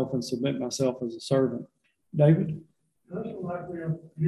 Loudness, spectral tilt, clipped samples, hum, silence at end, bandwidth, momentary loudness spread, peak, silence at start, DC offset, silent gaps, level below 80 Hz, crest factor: -28 LUFS; -7 dB/octave; under 0.1%; none; 0 s; 12 kHz; 16 LU; -10 dBFS; 0 s; under 0.1%; none; -62 dBFS; 18 dB